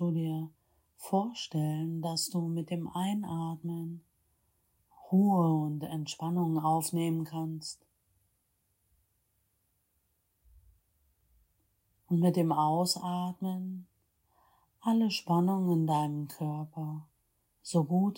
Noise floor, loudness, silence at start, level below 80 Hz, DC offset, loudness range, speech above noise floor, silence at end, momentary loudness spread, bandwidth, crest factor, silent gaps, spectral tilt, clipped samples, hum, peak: -76 dBFS; -32 LUFS; 0 s; -74 dBFS; under 0.1%; 5 LU; 46 dB; 0 s; 12 LU; 17 kHz; 18 dB; none; -6.5 dB/octave; under 0.1%; none; -16 dBFS